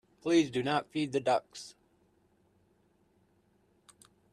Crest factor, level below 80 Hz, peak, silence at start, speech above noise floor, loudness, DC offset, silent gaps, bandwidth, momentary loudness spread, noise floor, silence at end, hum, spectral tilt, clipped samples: 20 dB; -74 dBFS; -14 dBFS; 0.25 s; 40 dB; -31 LUFS; under 0.1%; none; 11.5 kHz; 19 LU; -70 dBFS; 2.6 s; none; -5 dB/octave; under 0.1%